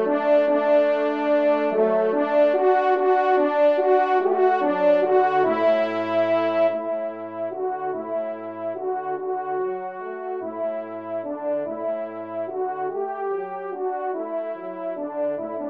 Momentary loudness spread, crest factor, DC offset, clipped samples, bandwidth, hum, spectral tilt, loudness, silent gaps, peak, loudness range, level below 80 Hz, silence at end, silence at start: 12 LU; 14 dB; under 0.1%; under 0.1%; 6 kHz; none; -7 dB/octave; -23 LUFS; none; -8 dBFS; 9 LU; -78 dBFS; 0 s; 0 s